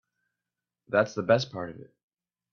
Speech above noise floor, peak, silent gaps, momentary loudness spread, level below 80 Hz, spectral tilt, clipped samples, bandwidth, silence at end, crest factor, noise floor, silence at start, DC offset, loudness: 62 dB; -8 dBFS; none; 13 LU; -70 dBFS; -5.5 dB/octave; under 0.1%; 7.2 kHz; 0.7 s; 22 dB; -89 dBFS; 0.9 s; under 0.1%; -27 LUFS